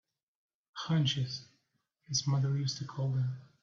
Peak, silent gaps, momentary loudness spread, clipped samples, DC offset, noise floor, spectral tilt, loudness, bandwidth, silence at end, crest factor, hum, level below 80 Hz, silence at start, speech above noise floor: -20 dBFS; none; 11 LU; under 0.1%; under 0.1%; -79 dBFS; -5 dB/octave; -33 LUFS; 7.6 kHz; 0.15 s; 16 dB; none; -70 dBFS; 0.75 s; 47 dB